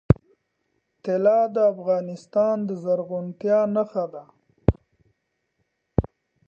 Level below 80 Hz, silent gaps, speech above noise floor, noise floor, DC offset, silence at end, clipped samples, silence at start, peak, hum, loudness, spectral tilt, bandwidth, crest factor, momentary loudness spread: -40 dBFS; none; 52 dB; -75 dBFS; under 0.1%; 0.4 s; under 0.1%; 0.1 s; 0 dBFS; none; -24 LUFS; -10 dB/octave; 7.6 kHz; 24 dB; 12 LU